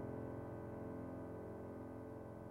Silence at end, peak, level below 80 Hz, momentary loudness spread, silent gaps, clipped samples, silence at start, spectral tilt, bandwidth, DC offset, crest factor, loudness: 0 s; -36 dBFS; -68 dBFS; 3 LU; none; under 0.1%; 0 s; -9.5 dB/octave; 16 kHz; under 0.1%; 14 dB; -50 LUFS